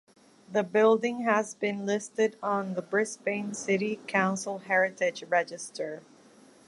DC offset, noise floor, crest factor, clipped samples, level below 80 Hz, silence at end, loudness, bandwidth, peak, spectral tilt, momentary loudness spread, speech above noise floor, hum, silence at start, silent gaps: under 0.1%; -56 dBFS; 20 dB; under 0.1%; -80 dBFS; 0.65 s; -28 LUFS; 11.5 kHz; -10 dBFS; -4.5 dB/octave; 11 LU; 28 dB; none; 0.5 s; none